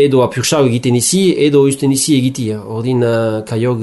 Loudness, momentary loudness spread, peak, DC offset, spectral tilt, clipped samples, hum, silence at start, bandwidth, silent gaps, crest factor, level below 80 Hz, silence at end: -13 LUFS; 7 LU; -2 dBFS; under 0.1%; -5 dB/octave; under 0.1%; none; 0 s; 12 kHz; none; 10 dB; -52 dBFS; 0 s